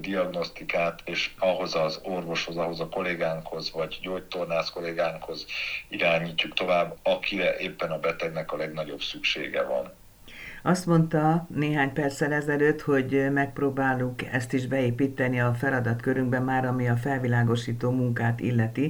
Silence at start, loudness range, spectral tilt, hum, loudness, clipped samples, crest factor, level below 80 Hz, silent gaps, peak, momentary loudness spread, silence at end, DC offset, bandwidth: 0 s; 5 LU; -6 dB/octave; none; -27 LUFS; under 0.1%; 20 dB; -54 dBFS; none; -8 dBFS; 8 LU; 0 s; under 0.1%; over 20 kHz